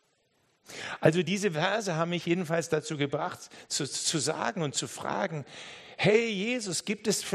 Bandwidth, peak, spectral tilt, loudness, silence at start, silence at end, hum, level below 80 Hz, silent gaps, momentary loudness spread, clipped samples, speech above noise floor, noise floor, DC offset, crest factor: 13 kHz; -8 dBFS; -4 dB/octave; -29 LUFS; 0.7 s; 0 s; none; -72 dBFS; none; 14 LU; under 0.1%; 41 dB; -71 dBFS; under 0.1%; 22 dB